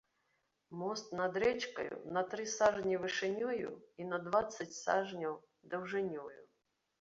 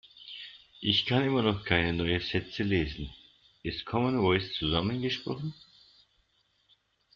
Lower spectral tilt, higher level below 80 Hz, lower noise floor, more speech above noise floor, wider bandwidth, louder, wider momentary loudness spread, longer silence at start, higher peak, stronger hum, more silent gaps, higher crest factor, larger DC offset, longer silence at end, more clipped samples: about the same, -3 dB/octave vs -3.5 dB/octave; second, -72 dBFS vs -52 dBFS; first, -82 dBFS vs -71 dBFS; about the same, 45 dB vs 42 dB; about the same, 7.6 kHz vs 7.4 kHz; second, -37 LUFS vs -29 LUFS; second, 12 LU vs 17 LU; first, 0.7 s vs 0.2 s; second, -18 dBFS vs -10 dBFS; neither; neither; about the same, 20 dB vs 22 dB; neither; second, 0.55 s vs 1.6 s; neither